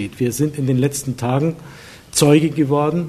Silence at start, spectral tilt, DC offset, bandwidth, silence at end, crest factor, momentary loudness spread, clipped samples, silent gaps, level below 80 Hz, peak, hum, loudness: 0 s; -5.5 dB/octave; under 0.1%; 13.5 kHz; 0 s; 18 dB; 9 LU; under 0.1%; none; -50 dBFS; 0 dBFS; none; -18 LUFS